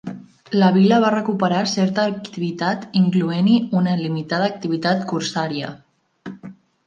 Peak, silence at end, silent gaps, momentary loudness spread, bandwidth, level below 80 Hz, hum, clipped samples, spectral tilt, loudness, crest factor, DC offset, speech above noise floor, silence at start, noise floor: -4 dBFS; 0.35 s; none; 19 LU; 7.4 kHz; -66 dBFS; none; under 0.1%; -6.5 dB/octave; -19 LUFS; 16 dB; under 0.1%; 22 dB; 0.05 s; -41 dBFS